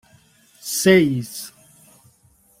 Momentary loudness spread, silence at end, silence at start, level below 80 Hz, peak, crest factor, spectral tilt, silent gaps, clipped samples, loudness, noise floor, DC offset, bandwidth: 20 LU; 1.1 s; 0.65 s; -60 dBFS; -2 dBFS; 20 dB; -4.5 dB/octave; none; under 0.1%; -18 LUFS; -57 dBFS; under 0.1%; 16 kHz